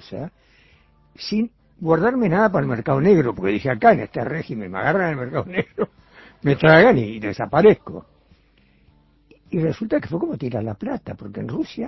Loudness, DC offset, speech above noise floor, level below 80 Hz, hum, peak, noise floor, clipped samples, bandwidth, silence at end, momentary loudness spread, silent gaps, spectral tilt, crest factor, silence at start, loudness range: -20 LUFS; under 0.1%; 38 dB; -50 dBFS; none; 0 dBFS; -57 dBFS; under 0.1%; 6 kHz; 0 s; 14 LU; none; -8 dB/octave; 20 dB; 0.1 s; 9 LU